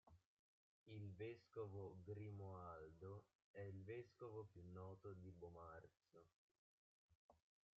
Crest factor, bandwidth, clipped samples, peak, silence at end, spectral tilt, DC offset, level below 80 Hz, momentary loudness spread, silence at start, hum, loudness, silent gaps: 16 dB; 7.2 kHz; under 0.1%; -42 dBFS; 0.4 s; -7.5 dB/octave; under 0.1%; -84 dBFS; 6 LU; 0.05 s; none; -58 LUFS; 0.25-0.86 s, 3.35-3.54 s, 6.33-7.09 s, 7.15-7.29 s